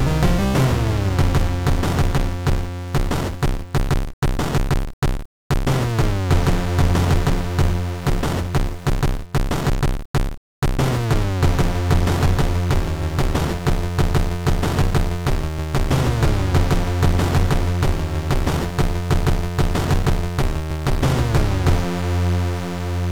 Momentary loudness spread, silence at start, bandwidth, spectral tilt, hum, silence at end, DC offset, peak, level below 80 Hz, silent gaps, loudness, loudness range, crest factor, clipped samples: 6 LU; 0 s; 18 kHz; -6 dB/octave; none; 0 s; 2%; -8 dBFS; -24 dBFS; 4.13-4.22 s, 4.93-5.02 s, 5.25-5.50 s, 10.05-10.14 s, 10.37-10.62 s; -21 LUFS; 2 LU; 12 dB; under 0.1%